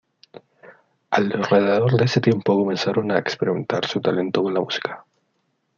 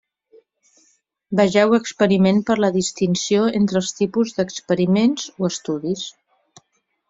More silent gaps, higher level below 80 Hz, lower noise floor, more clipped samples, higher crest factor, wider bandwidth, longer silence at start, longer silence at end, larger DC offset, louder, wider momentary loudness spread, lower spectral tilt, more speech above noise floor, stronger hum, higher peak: neither; second, -64 dBFS vs -58 dBFS; about the same, -70 dBFS vs -69 dBFS; neither; about the same, 18 dB vs 16 dB; about the same, 7.2 kHz vs 7.8 kHz; second, 0.65 s vs 1.3 s; second, 0.8 s vs 1 s; neither; about the same, -21 LUFS vs -19 LUFS; second, 6 LU vs 9 LU; about the same, -6.5 dB/octave vs -5.5 dB/octave; about the same, 50 dB vs 50 dB; neither; about the same, -4 dBFS vs -4 dBFS